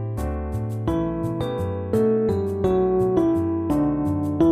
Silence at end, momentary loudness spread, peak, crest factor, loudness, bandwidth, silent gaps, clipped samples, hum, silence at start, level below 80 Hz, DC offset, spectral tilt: 0 s; 7 LU; -8 dBFS; 14 dB; -23 LUFS; 14.5 kHz; none; under 0.1%; none; 0 s; -38 dBFS; under 0.1%; -9 dB/octave